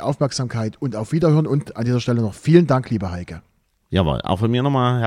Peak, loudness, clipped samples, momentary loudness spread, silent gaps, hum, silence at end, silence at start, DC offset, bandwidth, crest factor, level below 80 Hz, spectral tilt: 0 dBFS; -20 LUFS; under 0.1%; 10 LU; none; none; 0 s; 0 s; under 0.1%; 11.5 kHz; 18 dB; -42 dBFS; -7 dB/octave